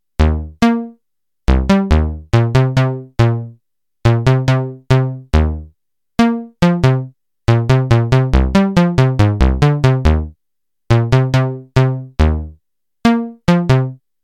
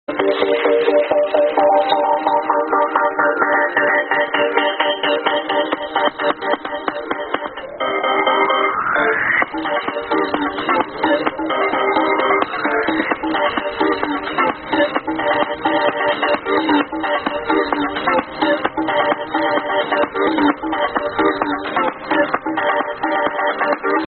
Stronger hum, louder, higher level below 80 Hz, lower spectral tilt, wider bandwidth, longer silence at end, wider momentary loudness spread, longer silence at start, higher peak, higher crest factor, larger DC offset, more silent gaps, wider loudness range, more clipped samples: neither; about the same, -15 LUFS vs -17 LUFS; first, -22 dBFS vs -52 dBFS; first, -7.5 dB/octave vs -1 dB/octave; first, 9.6 kHz vs 4.5 kHz; first, 0.3 s vs 0.05 s; first, 8 LU vs 5 LU; about the same, 0.2 s vs 0.1 s; about the same, 0 dBFS vs 0 dBFS; about the same, 14 dB vs 18 dB; first, 0.4% vs under 0.1%; neither; about the same, 3 LU vs 3 LU; neither